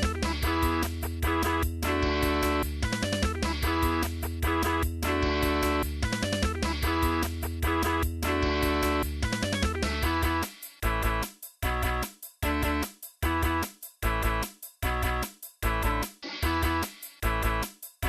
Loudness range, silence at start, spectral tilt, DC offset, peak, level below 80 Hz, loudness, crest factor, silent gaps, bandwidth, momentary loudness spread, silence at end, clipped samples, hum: 3 LU; 0 s; -5 dB/octave; under 0.1%; -14 dBFS; -34 dBFS; -29 LUFS; 14 dB; none; 15.5 kHz; 7 LU; 0 s; under 0.1%; none